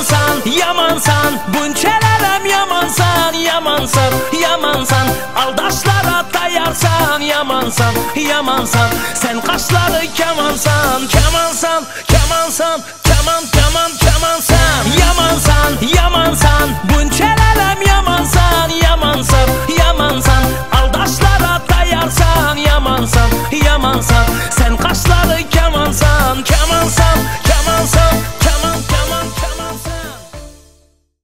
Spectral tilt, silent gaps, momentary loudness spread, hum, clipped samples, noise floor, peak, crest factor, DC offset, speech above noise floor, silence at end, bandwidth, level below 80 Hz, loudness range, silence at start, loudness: -4 dB/octave; none; 4 LU; none; under 0.1%; -52 dBFS; 0 dBFS; 12 dB; 4%; 41 dB; 0 s; 16.5 kHz; -18 dBFS; 2 LU; 0 s; -12 LUFS